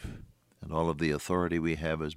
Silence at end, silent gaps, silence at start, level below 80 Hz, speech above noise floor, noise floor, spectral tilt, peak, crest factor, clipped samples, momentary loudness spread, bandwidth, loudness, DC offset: 0 s; none; 0 s; -50 dBFS; 21 dB; -51 dBFS; -6.5 dB/octave; -14 dBFS; 18 dB; under 0.1%; 17 LU; 16 kHz; -31 LUFS; under 0.1%